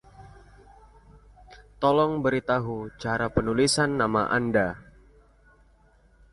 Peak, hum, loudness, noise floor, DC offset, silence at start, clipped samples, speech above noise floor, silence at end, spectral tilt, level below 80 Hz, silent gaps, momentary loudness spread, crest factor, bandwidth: -8 dBFS; none; -25 LUFS; -59 dBFS; under 0.1%; 0.2 s; under 0.1%; 35 dB; 1.5 s; -5 dB/octave; -50 dBFS; none; 8 LU; 18 dB; 11.5 kHz